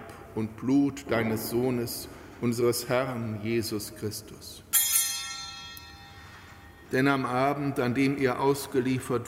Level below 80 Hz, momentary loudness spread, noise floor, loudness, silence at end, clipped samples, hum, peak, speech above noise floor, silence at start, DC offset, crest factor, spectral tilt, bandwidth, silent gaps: -58 dBFS; 18 LU; -49 dBFS; -28 LUFS; 0 s; under 0.1%; none; -8 dBFS; 21 dB; 0 s; under 0.1%; 20 dB; -4 dB/octave; 16 kHz; none